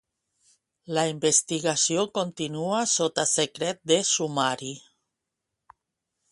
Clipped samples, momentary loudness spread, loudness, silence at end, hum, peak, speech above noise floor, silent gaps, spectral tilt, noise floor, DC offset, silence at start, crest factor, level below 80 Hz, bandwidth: under 0.1%; 9 LU; -24 LUFS; 1.5 s; none; -8 dBFS; 58 dB; none; -2.5 dB/octave; -84 dBFS; under 0.1%; 0.9 s; 20 dB; -70 dBFS; 11.5 kHz